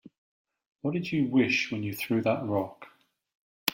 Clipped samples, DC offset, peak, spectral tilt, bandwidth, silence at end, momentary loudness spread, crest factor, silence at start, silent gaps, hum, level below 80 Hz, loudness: under 0.1%; under 0.1%; -8 dBFS; -5.5 dB/octave; 16.5 kHz; 0 s; 8 LU; 24 dB; 0.85 s; 3.35-3.66 s; none; -70 dBFS; -29 LUFS